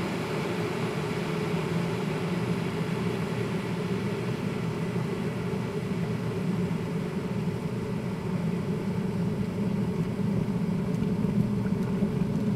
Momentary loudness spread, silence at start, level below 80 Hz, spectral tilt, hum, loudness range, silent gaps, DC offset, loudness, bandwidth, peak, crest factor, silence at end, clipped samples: 3 LU; 0 s; -52 dBFS; -7.5 dB/octave; none; 2 LU; none; under 0.1%; -30 LUFS; 14.5 kHz; -14 dBFS; 16 dB; 0 s; under 0.1%